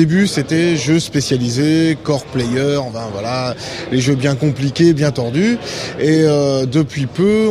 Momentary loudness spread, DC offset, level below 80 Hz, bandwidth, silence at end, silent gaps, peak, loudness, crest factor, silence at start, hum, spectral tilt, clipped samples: 8 LU; under 0.1%; -46 dBFS; 14 kHz; 0 s; none; -2 dBFS; -16 LUFS; 14 dB; 0 s; none; -6 dB/octave; under 0.1%